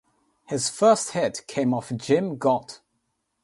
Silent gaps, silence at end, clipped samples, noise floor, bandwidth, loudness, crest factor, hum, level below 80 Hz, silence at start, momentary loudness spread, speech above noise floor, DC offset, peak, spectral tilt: none; 0.7 s; under 0.1%; -75 dBFS; 11.5 kHz; -24 LUFS; 20 dB; none; -66 dBFS; 0.5 s; 9 LU; 52 dB; under 0.1%; -4 dBFS; -4.5 dB/octave